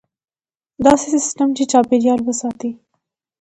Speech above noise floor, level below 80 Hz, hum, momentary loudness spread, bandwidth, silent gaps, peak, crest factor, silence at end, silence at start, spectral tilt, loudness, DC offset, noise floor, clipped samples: over 74 dB; -52 dBFS; none; 11 LU; 11 kHz; none; 0 dBFS; 18 dB; 0.65 s; 0.8 s; -4 dB/octave; -16 LUFS; under 0.1%; under -90 dBFS; under 0.1%